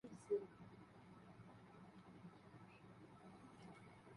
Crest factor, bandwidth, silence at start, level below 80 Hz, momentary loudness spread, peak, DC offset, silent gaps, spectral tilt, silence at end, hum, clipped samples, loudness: 24 dB; 11 kHz; 0.05 s; -82 dBFS; 17 LU; -32 dBFS; under 0.1%; none; -7 dB/octave; 0 s; none; under 0.1%; -56 LUFS